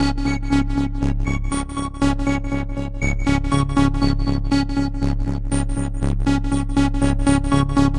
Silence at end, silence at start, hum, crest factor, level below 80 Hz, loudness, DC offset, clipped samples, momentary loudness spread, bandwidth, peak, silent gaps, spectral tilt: 0 s; 0 s; none; 16 dB; -24 dBFS; -21 LUFS; under 0.1%; under 0.1%; 6 LU; 11 kHz; -4 dBFS; none; -6 dB/octave